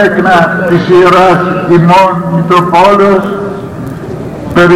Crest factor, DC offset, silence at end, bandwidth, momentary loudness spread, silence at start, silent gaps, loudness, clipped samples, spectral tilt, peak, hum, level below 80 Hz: 6 dB; under 0.1%; 0 s; 14.5 kHz; 15 LU; 0 s; none; -7 LUFS; 1%; -7 dB/octave; 0 dBFS; none; -36 dBFS